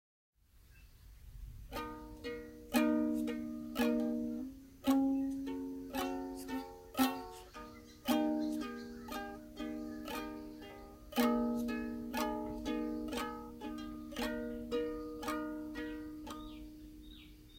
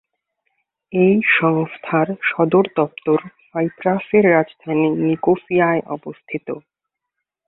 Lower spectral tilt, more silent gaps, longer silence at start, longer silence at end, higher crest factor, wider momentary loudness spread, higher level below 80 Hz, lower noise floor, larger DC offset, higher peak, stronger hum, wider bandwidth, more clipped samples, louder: second, -4.5 dB/octave vs -12 dB/octave; neither; second, 0.55 s vs 0.9 s; second, 0 s vs 0.9 s; about the same, 22 dB vs 18 dB; first, 18 LU vs 15 LU; about the same, -58 dBFS vs -62 dBFS; second, -62 dBFS vs -80 dBFS; neither; second, -18 dBFS vs -2 dBFS; neither; first, 16.5 kHz vs 4.1 kHz; neither; second, -39 LUFS vs -18 LUFS